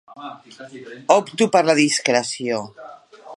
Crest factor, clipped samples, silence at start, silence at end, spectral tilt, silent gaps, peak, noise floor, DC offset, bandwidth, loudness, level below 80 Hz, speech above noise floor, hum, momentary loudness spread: 20 dB; under 0.1%; 0.1 s; 0 s; -3.5 dB/octave; none; 0 dBFS; -41 dBFS; under 0.1%; 11.5 kHz; -18 LUFS; -72 dBFS; 21 dB; none; 22 LU